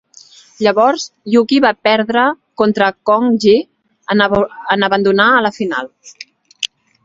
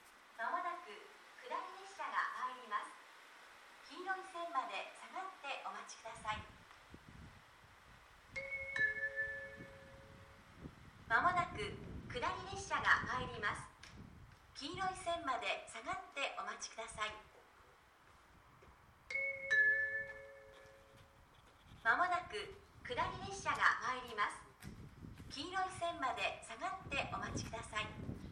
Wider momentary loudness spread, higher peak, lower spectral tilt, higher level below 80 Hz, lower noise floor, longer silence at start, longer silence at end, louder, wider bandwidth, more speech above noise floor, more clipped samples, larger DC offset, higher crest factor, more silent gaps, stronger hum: second, 13 LU vs 24 LU; first, 0 dBFS vs -16 dBFS; first, -4.5 dB/octave vs -3 dB/octave; first, -52 dBFS vs -64 dBFS; second, -43 dBFS vs -66 dBFS; first, 0.6 s vs 0 s; first, 0.4 s vs 0 s; first, -14 LUFS vs -40 LUFS; second, 7.8 kHz vs 15.5 kHz; first, 30 dB vs 26 dB; neither; neither; second, 14 dB vs 28 dB; neither; neither